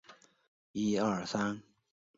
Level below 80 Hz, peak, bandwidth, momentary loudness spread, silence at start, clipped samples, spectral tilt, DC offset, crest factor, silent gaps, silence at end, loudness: -70 dBFS; -18 dBFS; 7.6 kHz; 12 LU; 0.1 s; under 0.1%; -5 dB/octave; under 0.1%; 18 dB; 0.48-0.74 s; 0.55 s; -34 LUFS